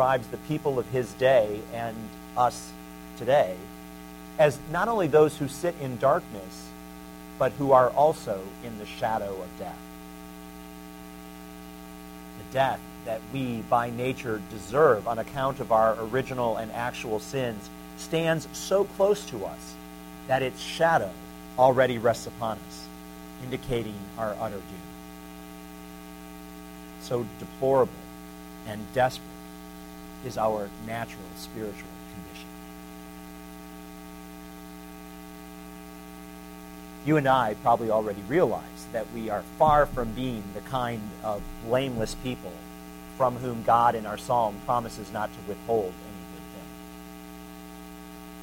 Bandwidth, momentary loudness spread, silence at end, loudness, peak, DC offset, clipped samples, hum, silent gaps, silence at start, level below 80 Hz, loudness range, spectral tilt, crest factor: 17 kHz; 21 LU; 0 s; -27 LUFS; -6 dBFS; under 0.1%; under 0.1%; none; none; 0 s; -50 dBFS; 12 LU; -5.5 dB/octave; 22 dB